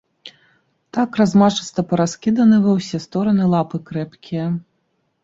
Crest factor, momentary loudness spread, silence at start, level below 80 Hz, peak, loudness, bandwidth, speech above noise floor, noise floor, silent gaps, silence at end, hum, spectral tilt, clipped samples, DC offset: 16 dB; 13 LU; 0.25 s; -56 dBFS; -2 dBFS; -18 LUFS; 7.8 kHz; 51 dB; -68 dBFS; none; 0.65 s; none; -6.5 dB/octave; under 0.1%; under 0.1%